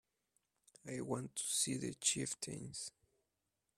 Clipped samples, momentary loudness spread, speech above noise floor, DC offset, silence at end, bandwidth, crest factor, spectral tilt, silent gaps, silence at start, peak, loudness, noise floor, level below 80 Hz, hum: under 0.1%; 12 LU; 46 dB; under 0.1%; 0.9 s; 15.5 kHz; 26 dB; -2.5 dB/octave; none; 0.85 s; -18 dBFS; -40 LUFS; -88 dBFS; -76 dBFS; none